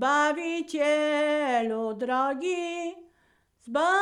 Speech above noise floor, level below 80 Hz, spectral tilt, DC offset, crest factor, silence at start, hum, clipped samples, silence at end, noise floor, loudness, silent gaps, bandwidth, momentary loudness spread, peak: 41 dB; -72 dBFS; -3 dB/octave; under 0.1%; 14 dB; 0 s; none; under 0.1%; 0 s; -67 dBFS; -27 LUFS; none; 11.5 kHz; 8 LU; -14 dBFS